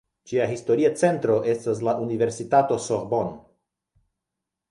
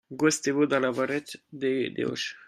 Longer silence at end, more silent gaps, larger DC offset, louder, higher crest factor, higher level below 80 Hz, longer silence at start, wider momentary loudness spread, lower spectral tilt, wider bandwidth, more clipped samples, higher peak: first, 1.3 s vs 0.05 s; neither; neither; first, -23 LUFS vs -27 LUFS; about the same, 18 dB vs 18 dB; first, -62 dBFS vs -72 dBFS; first, 0.25 s vs 0.1 s; about the same, 6 LU vs 8 LU; first, -6 dB/octave vs -4 dB/octave; second, 11.5 kHz vs 14.5 kHz; neither; first, -6 dBFS vs -10 dBFS